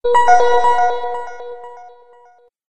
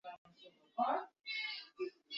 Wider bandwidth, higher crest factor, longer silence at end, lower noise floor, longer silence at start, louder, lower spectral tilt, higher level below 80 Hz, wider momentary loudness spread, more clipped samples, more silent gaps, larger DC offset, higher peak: first, 9.2 kHz vs 7.2 kHz; about the same, 14 dB vs 18 dB; about the same, 0 s vs 0 s; second, -50 dBFS vs -64 dBFS; about the same, 0 s vs 0.05 s; first, -14 LUFS vs -41 LUFS; first, -2 dB/octave vs 1 dB/octave; first, -48 dBFS vs under -90 dBFS; about the same, 22 LU vs 21 LU; neither; second, none vs 0.18-0.25 s; neither; first, -2 dBFS vs -24 dBFS